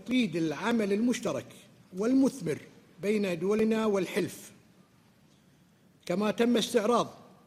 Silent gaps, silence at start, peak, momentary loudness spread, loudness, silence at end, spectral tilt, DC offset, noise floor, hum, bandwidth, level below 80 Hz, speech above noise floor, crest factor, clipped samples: none; 0 s; -12 dBFS; 12 LU; -29 LUFS; 0.25 s; -5.5 dB/octave; under 0.1%; -62 dBFS; none; 15.5 kHz; -70 dBFS; 34 dB; 18 dB; under 0.1%